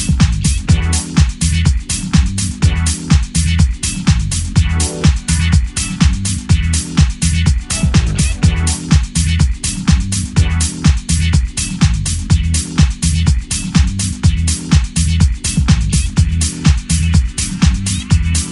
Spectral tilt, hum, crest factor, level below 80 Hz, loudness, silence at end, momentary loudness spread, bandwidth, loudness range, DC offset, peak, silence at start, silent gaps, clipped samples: -4.5 dB/octave; none; 14 dB; -16 dBFS; -14 LUFS; 0 s; 2 LU; 11.5 kHz; 1 LU; under 0.1%; 0 dBFS; 0 s; none; under 0.1%